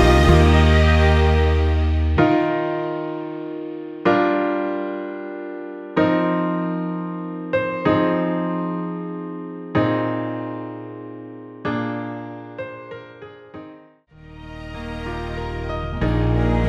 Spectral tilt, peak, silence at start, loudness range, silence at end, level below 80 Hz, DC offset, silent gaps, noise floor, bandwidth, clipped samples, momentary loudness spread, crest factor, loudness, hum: -7.5 dB/octave; -2 dBFS; 0 s; 13 LU; 0 s; -26 dBFS; under 0.1%; none; -47 dBFS; 9.2 kHz; under 0.1%; 19 LU; 18 dB; -21 LUFS; none